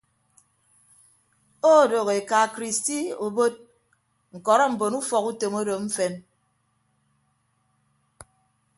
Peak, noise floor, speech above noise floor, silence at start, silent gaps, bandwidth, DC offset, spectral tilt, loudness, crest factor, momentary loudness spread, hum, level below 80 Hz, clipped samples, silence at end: -4 dBFS; -70 dBFS; 47 dB; 1.65 s; none; 12 kHz; under 0.1%; -3.5 dB/octave; -23 LUFS; 22 dB; 10 LU; none; -72 dBFS; under 0.1%; 2.55 s